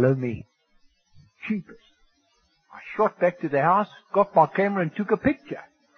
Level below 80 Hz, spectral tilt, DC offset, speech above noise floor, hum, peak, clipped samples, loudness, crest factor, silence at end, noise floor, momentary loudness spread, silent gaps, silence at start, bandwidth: -58 dBFS; -9 dB/octave; under 0.1%; 43 dB; none; -6 dBFS; under 0.1%; -24 LUFS; 20 dB; 0.35 s; -67 dBFS; 18 LU; none; 0 s; 6.6 kHz